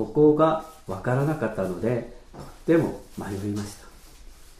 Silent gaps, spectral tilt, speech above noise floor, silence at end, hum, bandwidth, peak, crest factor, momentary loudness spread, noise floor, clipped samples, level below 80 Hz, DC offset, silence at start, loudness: none; -7.5 dB/octave; 22 dB; 0.05 s; none; 15 kHz; -8 dBFS; 18 dB; 20 LU; -46 dBFS; under 0.1%; -48 dBFS; under 0.1%; 0 s; -25 LUFS